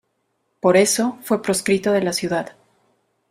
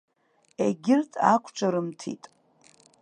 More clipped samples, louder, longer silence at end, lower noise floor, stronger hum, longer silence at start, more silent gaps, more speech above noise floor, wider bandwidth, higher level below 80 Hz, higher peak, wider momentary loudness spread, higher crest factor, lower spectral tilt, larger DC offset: neither; first, -19 LUFS vs -25 LUFS; about the same, 0.8 s vs 0.85 s; first, -71 dBFS vs -60 dBFS; neither; about the same, 0.65 s vs 0.6 s; neither; first, 52 dB vs 35 dB; first, 15.5 kHz vs 10 kHz; first, -60 dBFS vs -76 dBFS; first, -2 dBFS vs -6 dBFS; second, 9 LU vs 16 LU; about the same, 18 dB vs 22 dB; second, -4 dB/octave vs -6 dB/octave; neither